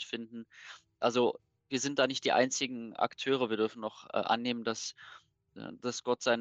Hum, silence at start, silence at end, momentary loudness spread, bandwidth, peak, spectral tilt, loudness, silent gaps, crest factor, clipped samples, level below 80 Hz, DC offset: none; 0 s; 0 s; 19 LU; 8.6 kHz; -14 dBFS; -3 dB/octave; -33 LUFS; none; 20 dB; under 0.1%; -80 dBFS; under 0.1%